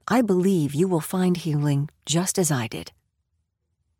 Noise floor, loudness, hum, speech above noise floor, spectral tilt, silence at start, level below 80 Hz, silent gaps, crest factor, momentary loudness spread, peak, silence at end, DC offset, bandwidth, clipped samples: -75 dBFS; -23 LUFS; none; 52 dB; -5.5 dB/octave; 0.05 s; -60 dBFS; none; 14 dB; 7 LU; -10 dBFS; 1.1 s; under 0.1%; 17.5 kHz; under 0.1%